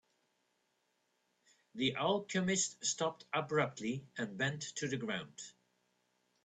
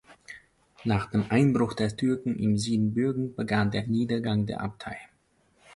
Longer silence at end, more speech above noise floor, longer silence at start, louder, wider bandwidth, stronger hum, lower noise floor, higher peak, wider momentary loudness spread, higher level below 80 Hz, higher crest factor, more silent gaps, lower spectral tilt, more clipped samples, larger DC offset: first, 0.95 s vs 0 s; about the same, 43 dB vs 40 dB; first, 1.75 s vs 0.1 s; second, -37 LUFS vs -27 LUFS; second, 9.4 kHz vs 11.5 kHz; neither; first, -80 dBFS vs -67 dBFS; second, -18 dBFS vs -10 dBFS; second, 10 LU vs 17 LU; second, -76 dBFS vs -54 dBFS; about the same, 20 dB vs 16 dB; neither; second, -3.5 dB/octave vs -7 dB/octave; neither; neither